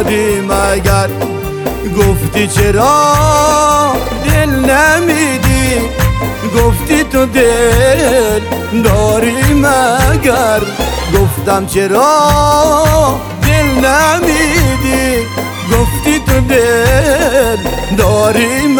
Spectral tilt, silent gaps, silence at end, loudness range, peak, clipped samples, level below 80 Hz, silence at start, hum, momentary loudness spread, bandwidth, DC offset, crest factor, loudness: -5 dB/octave; none; 0 s; 2 LU; 0 dBFS; under 0.1%; -20 dBFS; 0 s; none; 6 LU; over 20 kHz; under 0.1%; 10 dB; -10 LUFS